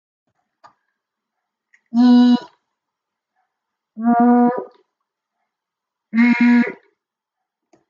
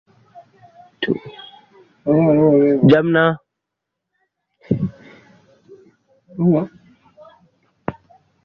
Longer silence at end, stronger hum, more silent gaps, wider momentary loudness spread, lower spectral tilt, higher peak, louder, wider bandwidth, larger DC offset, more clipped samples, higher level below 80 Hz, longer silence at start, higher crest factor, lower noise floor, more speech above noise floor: first, 1.15 s vs 0.55 s; neither; neither; second, 12 LU vs 18 LU; second, -7 dB/octave vs -9.5 dB/octave; about the same, -4 dBFS vs -2 dBFS; about the same, -15 LUFS vs -17 LUFS; first, 6.8 kHz vs 5.6 kHz; neither; neither; second, -76 dBFS vs -56 dBFS; first, 1.95 s vs 0.35 s; about the same, 16 dB vs 18 dB; about the same, -83 dBFS vs -80 dBFS; about the same, 70 dB vs 67 dB